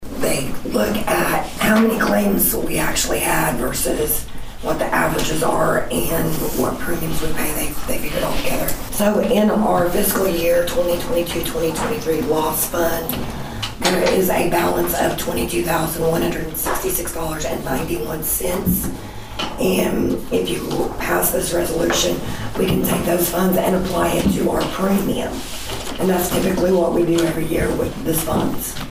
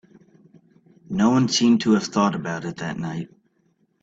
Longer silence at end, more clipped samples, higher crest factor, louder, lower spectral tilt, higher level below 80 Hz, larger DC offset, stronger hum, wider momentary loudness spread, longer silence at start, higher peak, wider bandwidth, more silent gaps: second, 0 s vs 0.75 s; neither; about the same, 16 dB vs 18 dB; about the same, -19 LUFS vs -21 LUFS; about the same, -4.5 dB/octave vs -5 dB/octave; first, -32 dBFS vs -60 dBFS; neither; neither; second, 7 LU vs 13 LU; second, 0 s vs 1.1 s; about the same, -4 dBFS vs -6 dBFS; first, 16 kHz vs 8 kHz; neither